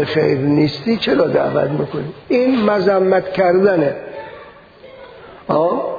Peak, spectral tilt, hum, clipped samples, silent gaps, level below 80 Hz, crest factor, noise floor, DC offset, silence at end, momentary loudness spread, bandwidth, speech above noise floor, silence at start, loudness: -2 dBFS; -8 dB/octave; none; under 0.1%; none; -52 dBFS; 14 dB; -40 dBFS; under 0.1%; 0 s; 14 LU; 5 kHz; 25 dB; 0 s; -16 LUFS